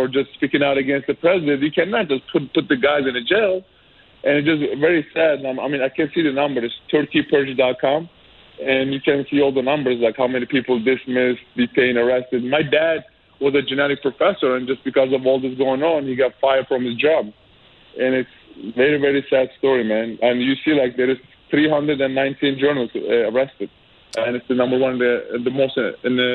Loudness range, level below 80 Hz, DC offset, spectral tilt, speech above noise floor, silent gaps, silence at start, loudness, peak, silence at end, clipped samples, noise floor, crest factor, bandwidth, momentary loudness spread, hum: 2 LU; -58 dBFS; under 0.1%; -7 dB/octave; 31 dB; none; 0 s; -19 LUFS; -4 dBFS; 0 s; under 0.1%; -50 dBFS; 16 dB; 8.2 kHz; 6 LU; none